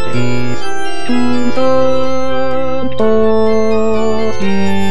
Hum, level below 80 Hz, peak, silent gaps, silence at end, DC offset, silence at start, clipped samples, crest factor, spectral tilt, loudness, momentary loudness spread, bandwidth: none; -38 dBFS; 0 dBFS; none; 0 s; 40%; 0 s; under 0.1%; 10 dB; -6 dB/octave; -15 LUFS; 7 LU; 11 kHz